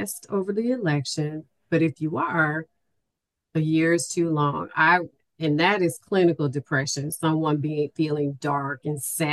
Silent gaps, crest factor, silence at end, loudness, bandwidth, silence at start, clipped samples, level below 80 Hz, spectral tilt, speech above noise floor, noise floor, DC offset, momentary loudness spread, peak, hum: none; 18 dB; 0 s; -24 LUFS; 12.5 kHz; 0 s; under 0.1%; -68 dBFS; -5 dB/octave; 59 dB; -83 dBFS; under 0.1%; 8 LU; -6 dBFS; none